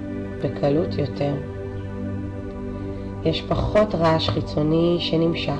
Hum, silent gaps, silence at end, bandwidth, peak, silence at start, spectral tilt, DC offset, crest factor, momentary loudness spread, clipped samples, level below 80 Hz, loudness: none; none; 0 s; 9 kHz; -8 dBFS; 0 s; -7.5 dB/octave; under 0.1%; 14 dB; 12 LU; under 0.1%; -38 dBFS; -23 LUFS